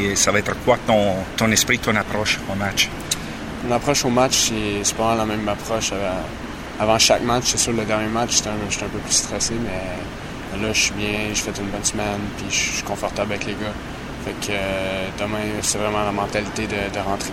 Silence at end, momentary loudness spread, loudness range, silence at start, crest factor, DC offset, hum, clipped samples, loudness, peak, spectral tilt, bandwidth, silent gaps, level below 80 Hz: 0 s; 11 LU; 5 LU; 0 s; 20 dB; under 0.1%; none; under 0.1%; -21 LUFS; -2 dBFS; -3 dB/octave; 16 kHz; none; -38 dBFS